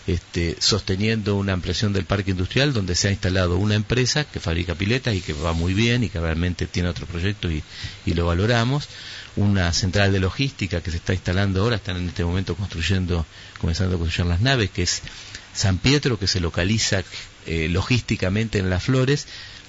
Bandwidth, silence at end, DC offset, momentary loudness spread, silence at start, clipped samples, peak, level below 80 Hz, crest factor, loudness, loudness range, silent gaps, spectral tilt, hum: 8 kHz; 0 s; under 0.1%; 8 LU; 0 s; under 0.1%; -4 dBFS; -36 dBFS; 18 dB; -22 LUFS; 2 LU; none; -5 dB/octave; none